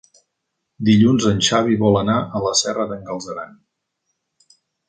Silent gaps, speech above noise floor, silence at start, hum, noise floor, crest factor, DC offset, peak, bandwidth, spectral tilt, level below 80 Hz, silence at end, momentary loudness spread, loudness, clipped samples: none; 59 dB; 0.8 s; none; -77 dBFS; 18 dB; under 0.1%; -2 dBFS; 9.4 kHz; -4.5 dB/octave; -50 dBFS; 1.4 s; 15 LU; -18 LUFS; under 0.1%